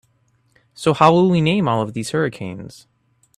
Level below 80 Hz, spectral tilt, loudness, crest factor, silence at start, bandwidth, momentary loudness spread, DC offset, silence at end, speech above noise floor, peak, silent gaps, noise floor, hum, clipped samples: -56 dBFS; -6.5 dB/octave; -17 LUFS; 20 dB; 0.8 s; 13 kHz; 18 LU; under 0.1%; 0.65 s; 44 dB; 0 dBFS; none; -62 dBFS; none; under 0.1%